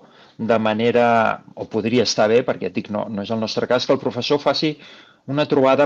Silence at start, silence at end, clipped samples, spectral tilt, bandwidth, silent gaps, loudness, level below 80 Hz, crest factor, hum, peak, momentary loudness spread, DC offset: 0.4 s; 0 s; under 0.1%; -5 dB/octave; 7.8 kHz; none; -20 LUFS; -62 dBFS; 16 dB; none; -4 dBFS; 10 LU; under 0.1%